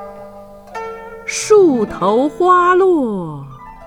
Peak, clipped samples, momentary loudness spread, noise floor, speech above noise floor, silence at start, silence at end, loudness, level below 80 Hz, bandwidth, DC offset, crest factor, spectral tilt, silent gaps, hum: 0 dBFS; under 0.1%; 21 LU; -36 dBFS; 23 dB; 0 s; 0 s; -13 LUFS; -46 dBFS; 13 kHz; under 0.1%; 14 dB; -5 dB/octave; none; 50 Hz at -45 dBFS